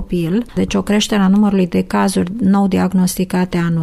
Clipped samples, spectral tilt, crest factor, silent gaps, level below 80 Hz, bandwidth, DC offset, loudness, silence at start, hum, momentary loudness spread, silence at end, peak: under 0.1%; -6 dB/octave; 10 dB; none; -38 dBFS; 13.5 kHz; under 0.1%; -15 LUFS; 0 s; none; 5 LU; 0 s; -4 dBFS